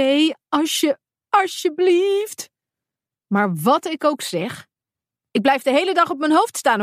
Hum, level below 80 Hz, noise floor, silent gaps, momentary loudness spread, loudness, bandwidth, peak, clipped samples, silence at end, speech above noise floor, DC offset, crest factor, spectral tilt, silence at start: none; -74 dBFS; -89 dBFS; none; 11 LU; -19 LUFS; 15.5 kHz; -2 dBFS; under 0.1%; 0 s; 70 dB; under 0.1%; 18 dB; -4 dB/octave; 0 s